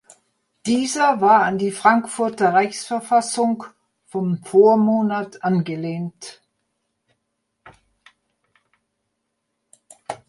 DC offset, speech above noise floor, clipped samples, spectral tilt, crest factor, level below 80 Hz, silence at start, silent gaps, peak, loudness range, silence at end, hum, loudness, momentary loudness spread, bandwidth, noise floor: under 0.1%; 57 dB; under 0.1%; -5 dB/octave; 20 dB; -68 dBFS; 0.65 s; none; -2 dBFS; 11 LU; 0.15 s; none; -19 LUFS; 16 LU; 11.5 kHz; -76 dBFS